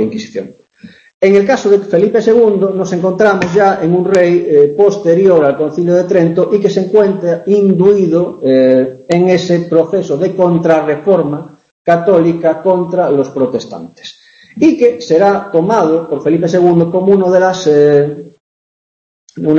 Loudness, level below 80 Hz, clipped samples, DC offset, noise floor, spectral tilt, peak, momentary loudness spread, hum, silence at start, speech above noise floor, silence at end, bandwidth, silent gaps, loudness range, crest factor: -11 LUFS; -54 dBFS; under 0.1%; under 0.1%; under -90 dBFS; -7 dB/octave; 0 dBFS; 7 LU; none; 0 s; over 80 dB; 0 s; 7.8 kHz; 1.14-1.21 s, 11.71-11.85 s, 18.40-19.27 s; 3 LU; 10 dB